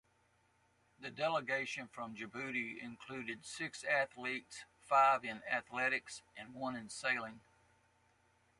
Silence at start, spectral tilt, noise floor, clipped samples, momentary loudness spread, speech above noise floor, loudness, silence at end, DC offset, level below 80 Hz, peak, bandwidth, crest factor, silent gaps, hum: 1 s; -3 dB/octave; -75 dBFS; under 0.1%; 17 LU; 36 dB; -38 LUFS; 1.2 s; under 0.1%; -80 dBFS; -18 dBFS; 11.5 kHz; 22 dB; none; none